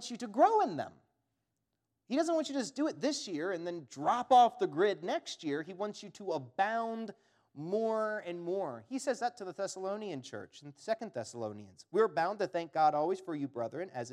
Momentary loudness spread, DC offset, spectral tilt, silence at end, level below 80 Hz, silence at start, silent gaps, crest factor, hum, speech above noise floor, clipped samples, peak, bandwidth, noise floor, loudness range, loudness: 14 LU; under 0.1%; -4.5 dB/octave; 0 s; -88 dBFS; 0 s; none; 20 dB; none; 51 dB; under 0.1%; -14 dBFS; 11.5 kHz; -85 dBFS; 6 LU; -34 LUFS